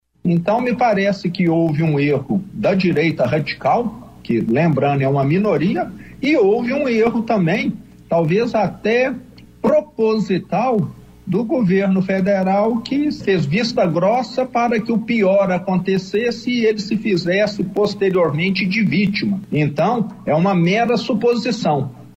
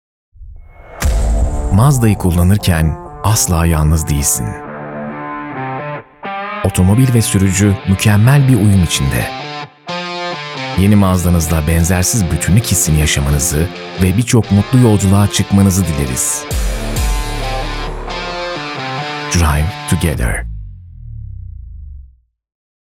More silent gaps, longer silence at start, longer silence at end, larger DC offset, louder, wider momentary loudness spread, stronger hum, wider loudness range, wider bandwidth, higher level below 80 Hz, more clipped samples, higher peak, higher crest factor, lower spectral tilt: neither; second, 0.25 s vs 0.4 s; second, 0.1 s vs 1 s; neither; second, -18 LUFS vs -14 LUFS; second, 5 LU vs 14 LU; neither; second, 1 LU vs 6 LU; second, 8.2 kHz vs 18 kHz; second, -52 dBFS vs -24 dBFS; neither; second, -4 dBFS vs 0 dBFS; about the same, 14 dB vs 14 dB; first, -7.5 dB/octave vs -5 dB/octave